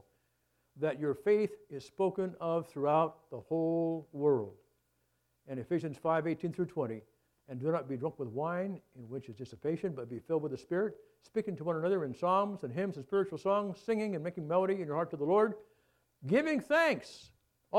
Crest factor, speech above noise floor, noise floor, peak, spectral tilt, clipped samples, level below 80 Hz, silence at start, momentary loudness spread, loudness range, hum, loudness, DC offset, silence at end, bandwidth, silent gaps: 20 dB; 44 dB; -78 dBFS; -14 dBFS; -7.5 dB/octave; under 0.1%; -76 dBFS; 0.75 s; 14 LU; 5 LU; none; -34 LUFS; under 0.1%; 0 s; 12.5 kHz; none